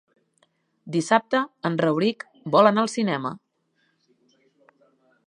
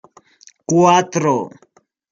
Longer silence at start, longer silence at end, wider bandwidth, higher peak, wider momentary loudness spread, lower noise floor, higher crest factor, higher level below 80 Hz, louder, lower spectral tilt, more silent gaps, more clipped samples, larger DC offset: first, 0.85 s vs 0.7 s; first, 1.9 s vs 0.65 s; first, 11 kHz vs 7.6 kHz; about the same, -2 dBFS vs 0 dBFS; second, 12 LU vs 19 LU; first, -70 dBFS vs -49 dBFS; about the same, 22 dB vs 18 dB; second, -76 dBFS vs -62 dBFS; second, -22 LUFS vs -15 LUFS; about the same, -5.5 dB/octave vs -5 dB/octave; neither; neither; neither